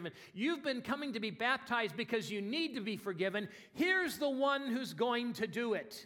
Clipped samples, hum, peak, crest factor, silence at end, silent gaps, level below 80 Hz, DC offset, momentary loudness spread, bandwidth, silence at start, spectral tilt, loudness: under 0.1%; none; -18 dBFS; 18 dB; 0 s; none; -78 dBFS; under 0.1%; 7 LU; 17.5 kHz; 0 s; -4.5 dB/octave; -36 LUFS